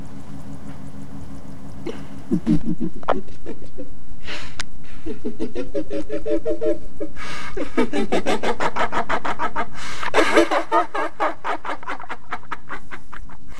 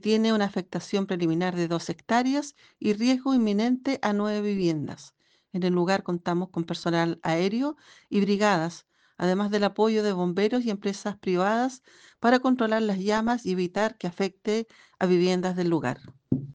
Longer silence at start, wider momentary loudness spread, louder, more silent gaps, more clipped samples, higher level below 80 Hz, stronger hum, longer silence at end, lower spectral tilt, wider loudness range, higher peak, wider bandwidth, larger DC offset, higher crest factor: about the same, 0 s vs 0.05 s; first, 17 LU vs 8 LU; about the same, -25 LUFS vs -26 LUFS; neither; neither; first, -42 dBFS vs -66 dBFS; neither; about the same, 0 s vs 0 s; about the same, -5 dB/octave vs -6 dB/octave; first, 8 LU vs 2 LU; first, 0 dBFS vs -8 dBFS; first, 14.5 kHz vs 9.6 kHz; first, 20% vs under 0.1%; about the same, 20 dB vs 18 dB